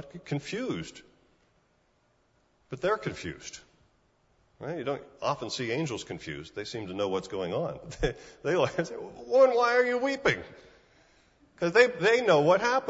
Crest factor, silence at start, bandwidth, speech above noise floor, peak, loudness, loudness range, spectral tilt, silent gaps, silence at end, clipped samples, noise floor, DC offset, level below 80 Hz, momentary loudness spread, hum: 22 dB; 0 s; 8 kHz; 41 dB; -6 dBFS; -28 LUFS; 12 LU; -5 dB/octave; none; 0 s; under 0.1%; -69 dBFS; under 0.1%; -54 dBFS; 16 LU; none